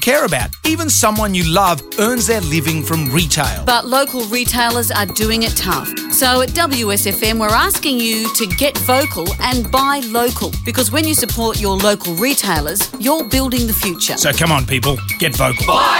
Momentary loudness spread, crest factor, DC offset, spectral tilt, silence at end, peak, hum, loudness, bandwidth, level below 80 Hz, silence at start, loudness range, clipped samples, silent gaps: 4 LU; 14 dB; under 0.1%; -3 dB/octave; 0 s; 0 dBFS; none; -15 LUFS; 17 kHz; -30 dBFS; 0 s; 1 LU; under 0.1%; none